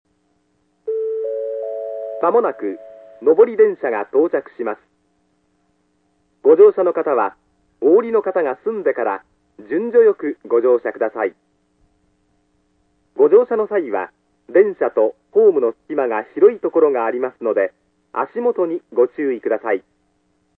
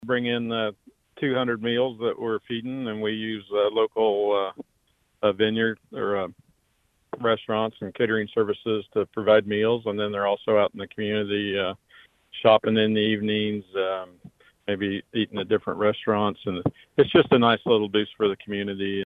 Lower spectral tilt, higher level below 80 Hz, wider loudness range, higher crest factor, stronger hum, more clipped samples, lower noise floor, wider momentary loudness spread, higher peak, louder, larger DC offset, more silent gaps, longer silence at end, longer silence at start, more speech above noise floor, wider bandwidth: first, -9.5 dB/octave vs -8 dB/octave; second, -72 dBFS vs -64 dBFS; about the same, 4 LU vs 5 LU; about the same, 18 dB vs 20 dB; neither; neither; second, -64 dBFS vs -69 dBFS; about the same, 12 LU vs 11 LU; first, 0 dBFS vs -4 dBFS; first, -18 LUFS vs -24 LUFS; neither; neither; first, 0.8 s vs 0 s; first, 0.85 s vs 0 s; about the same, 48 dB vs 45 dB; second, 3.7 kHz vs 4.2 kHz